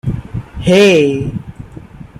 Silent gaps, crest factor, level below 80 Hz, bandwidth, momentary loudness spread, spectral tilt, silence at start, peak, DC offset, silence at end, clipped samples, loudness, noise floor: none; 14 dB; -34 dBFS; 13.5 kHz; 24 LU; -6 dB/octave; 0.05 s; 0 dBFS; under 0.1%; 0.15 s; under 0.1%; -12 LUFS; -33 dBFS